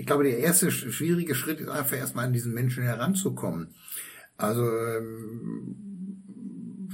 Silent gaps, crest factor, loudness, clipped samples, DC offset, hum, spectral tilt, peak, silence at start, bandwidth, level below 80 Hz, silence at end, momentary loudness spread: none; 20 dB; -28 LUFS; under 0.1%; under 0.1%; none; -5 dB/octave; -8 dBFS; 0 s; 16.5 kHz; -68 dBFS; 0 s; 17 LU